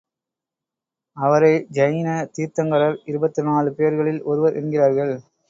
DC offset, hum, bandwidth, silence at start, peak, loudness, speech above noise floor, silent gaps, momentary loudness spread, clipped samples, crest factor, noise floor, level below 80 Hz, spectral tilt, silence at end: under 0.1%; none; 7.8 kHz; 1.15 s; -4 dBFS; -20 LUFS; 68 dB; none; 8 LU; under 0.1%; 18 dB; -87 dBFS; -66 dBFS; -7.5 dB/octave; 0.3 s